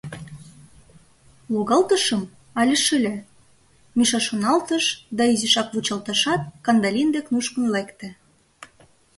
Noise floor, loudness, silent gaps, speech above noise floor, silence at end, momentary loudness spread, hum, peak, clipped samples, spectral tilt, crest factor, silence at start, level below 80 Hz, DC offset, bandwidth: -56 dBFS; -21 LUFS; none; 35 dB; 0.55 s; 14 LU; none; -4 dBFS; under 0.1%; -3 dB/octave; 18 dB; 0.05 s; -60 dBFS; under 0.1%; 12 kHz